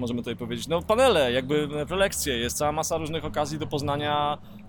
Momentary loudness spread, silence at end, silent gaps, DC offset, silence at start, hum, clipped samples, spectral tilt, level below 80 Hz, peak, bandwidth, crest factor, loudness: 9 LU; 0 s; none; under 0.1%; 0 s; none; under 0.1%; -4 dB/octave; -46 dBFS; -10 dBFS; 19 kHz; 16 dB; -26 LUFS